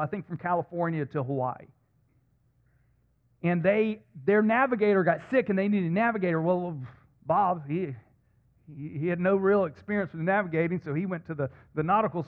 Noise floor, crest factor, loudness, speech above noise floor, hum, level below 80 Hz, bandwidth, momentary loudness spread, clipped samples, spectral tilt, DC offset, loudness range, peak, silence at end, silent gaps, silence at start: -67 dBFS; 18 dB; -27 LUFS; 40 dB; none; -66 dBFS; 4.5 kHz; 11 LU; under 0.1%; -10 dB/octave; under 0.1%; 6 LU; -10 dBFS; 0.05 s; none; 0 s